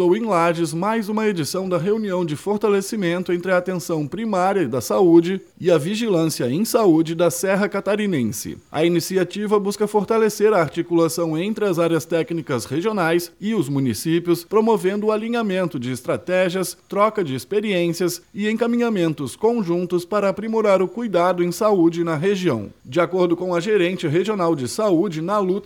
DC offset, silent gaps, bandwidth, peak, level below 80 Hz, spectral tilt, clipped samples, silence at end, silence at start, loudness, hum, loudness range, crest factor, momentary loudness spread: under 0.1%; none; 18 kHz; -4 dBFS; -62 dBFS; -5.5 dB/octave; under 0.1%; 0 s; 0 s; -20 LUFS; none; 3 LU; 16 dB; 6 LU